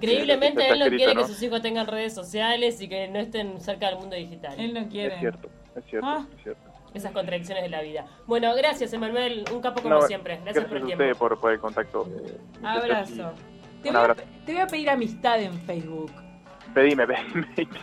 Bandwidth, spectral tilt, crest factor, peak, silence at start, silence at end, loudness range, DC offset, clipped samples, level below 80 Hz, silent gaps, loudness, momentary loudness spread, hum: 14.5 kHz; -4.5 dB/octave; 20 dB; -6 dBFS; 0 s; 0 s; 7 LU; under 0.1%; under 0.1%; -58 dBFS; none; -25 LUFS; 16 LU; none